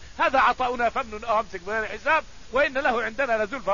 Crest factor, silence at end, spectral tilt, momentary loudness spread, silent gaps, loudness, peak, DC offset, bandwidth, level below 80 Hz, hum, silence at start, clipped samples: 16 dB; 0 s; -4 dB/octave; 8 LU; none; -24 LUFS; -8 dBFS; 0.6%; 7.4 kHz; -48 dBFS; none; 0 s; under 0.1%